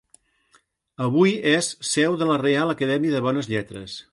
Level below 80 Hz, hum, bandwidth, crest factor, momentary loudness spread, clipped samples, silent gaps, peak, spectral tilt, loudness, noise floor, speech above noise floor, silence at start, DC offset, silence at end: -62 dBFS; none; 11.5 kHz; 18 dB; 9 LU; under 0.1%; none; -6 dBFS; -4.5 dB/octave; -22 LUFS; -62 dBFS; 41 dB; 1 s; under 0.1%; 0.1 s